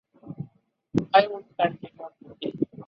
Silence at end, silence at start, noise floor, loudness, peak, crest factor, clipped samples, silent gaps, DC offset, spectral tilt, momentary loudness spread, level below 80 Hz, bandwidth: 0.05 s; 0.25 s; -56 dBFS; -25 LUFS; -4 dBFS; 24 dB; under 0.1%; none; under 0.1%; -7 dB/octave; 22 LU; -60 dBFS; 7.4 kHz